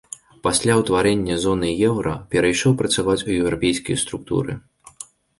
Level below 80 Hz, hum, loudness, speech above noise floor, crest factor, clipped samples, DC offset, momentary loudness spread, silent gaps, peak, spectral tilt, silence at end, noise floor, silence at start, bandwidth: -44 dBFS; none; -20 LUFS; 23 dB; 18 dB; under 0.1%; under 0.1%; 18 LU; none; -4 dBFS; -4.5 dB/octave; 0.35 s; -43 dBFS; 0.45 s; 11.5 kHz